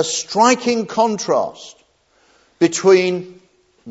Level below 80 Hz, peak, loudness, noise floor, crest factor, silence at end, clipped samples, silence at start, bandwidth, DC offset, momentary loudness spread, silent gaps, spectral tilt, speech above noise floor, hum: -68 dBFS; 0 dBFS; -17 LUFS; -58 dBFS; 18 dB; 0 s; under 0.1%; 0 s; 8 kHz; under 0.1%; 12 LU; none; -3.5 dB/octave; 41 dB; none